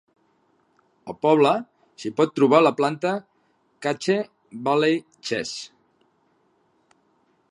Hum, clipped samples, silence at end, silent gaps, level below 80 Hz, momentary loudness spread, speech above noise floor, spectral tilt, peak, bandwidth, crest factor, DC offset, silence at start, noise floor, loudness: none; under 0.1%; 1.85 s; none; -74 dBFS; 18 LU; 45 dB; -5.5 dB/octave; -2 dBFS; 11 kHz; 22 dB; under 0.1%; 1.05 s; -65 dBFS; -22 LUFS